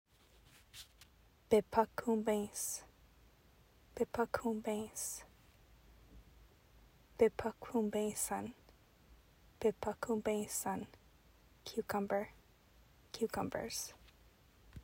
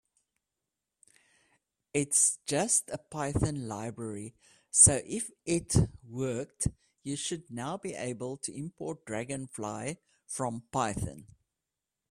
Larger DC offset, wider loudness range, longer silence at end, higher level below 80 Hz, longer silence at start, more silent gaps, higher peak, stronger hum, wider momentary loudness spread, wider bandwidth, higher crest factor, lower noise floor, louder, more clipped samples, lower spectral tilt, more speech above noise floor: neither; second, 4 LU vs 10 LU; second, 0 s vs 0.85 s; second, -66 dBFS vs -52 dBFS; second, 0.75 s vs 1.95 s; neither; second, -16 dBFS vs -6 dBFS; neither; first, 19 LU vs 16 LU; about the same, 16 kHz vs 15 kHz; about the same, 24 dB vs 26 dB; second, -67 dBFS vs -88 dBFS; second, -38 LUFS vs -30 LUFS; neither; about the same, -4 dB/octave vs -4 dB/octave; second, 29 dB vs 57 dB